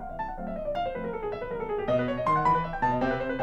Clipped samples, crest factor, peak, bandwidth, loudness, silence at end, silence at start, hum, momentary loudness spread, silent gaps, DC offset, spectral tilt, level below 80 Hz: under 0.1%; 16 dB; -12 dBFS; 9 kHz; -29 LUFS; 0 s; 0 s; none; 10 LU; none; under 0.1%; -7.5 dB/octave; -44 dBFS